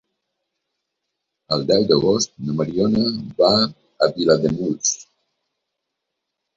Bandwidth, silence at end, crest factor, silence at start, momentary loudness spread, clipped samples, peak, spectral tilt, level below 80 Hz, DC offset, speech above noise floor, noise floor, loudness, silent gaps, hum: 7.8 kHz; 1.55 s; 20 dB; 1.5 s; 8 LU; under 0.1%; -2 dBFS; -4.5 dB/octave; -54 dBFS; under 0.1%; 61 dB; -80 dBFS; -19 LUFS; none; none